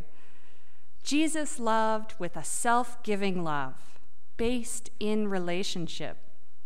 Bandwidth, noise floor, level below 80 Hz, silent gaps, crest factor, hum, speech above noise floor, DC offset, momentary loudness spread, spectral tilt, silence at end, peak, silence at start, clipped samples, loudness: 15.5 kHz; -65 dBFS; -54 dBFS; none; 18 dB; none; 34 dB; 5%; 10 LU; -4 dB/octave; 0.5 s; -14 dBFS; 1.05 s; under 0.1%; -31 LUFS